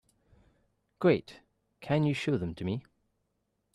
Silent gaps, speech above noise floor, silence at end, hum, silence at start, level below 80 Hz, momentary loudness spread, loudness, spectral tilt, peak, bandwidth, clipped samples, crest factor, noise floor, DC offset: none; 50 dB; 0.95 s; none; 1 s; -64 dBFS; 10 LU; -31 LUFS; -7.5 dB/octave; -14 dBFS; 12 kHz; under 0.1%; 20 dB; -79 dBFS; under 0.1%